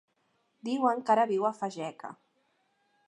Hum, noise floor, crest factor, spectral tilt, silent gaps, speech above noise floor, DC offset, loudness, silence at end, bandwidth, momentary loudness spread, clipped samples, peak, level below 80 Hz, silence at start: none; -74 dBFS; 20 dB; -5.5 dB/octave; none; 45 dB; under 0.1%; -29 LUFS; 0.95 s; 10.5 kHz; 17 LU; under 0.1%; -12 dBFS; -88 dBFS; 0.65 s